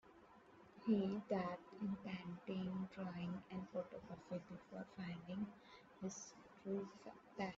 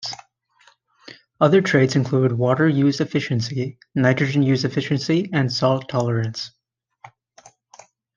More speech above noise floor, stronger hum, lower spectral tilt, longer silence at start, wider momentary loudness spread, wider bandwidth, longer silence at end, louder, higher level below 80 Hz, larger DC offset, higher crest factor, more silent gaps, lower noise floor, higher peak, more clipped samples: second, 19 dB vs 38 dB; neither; about the same, -6.5 dB/octave vs -6.5 dB/octave; about the same, 0.05 s vs 0 s; first, 17 LU vs 10 LU; about the same, 7.6 kHz vs 7.4 kHz; second, 0 s vs 1.1 s; second, -48 LUFS vs -20 LUFS; second, -78 dBFS vs -64 dBFS; neither; about the same, 20 dB vs 20 dB; neither; first, -66 dBFS vs -57 dBFS; second, -26 dBFS vs 0 dBFS; neither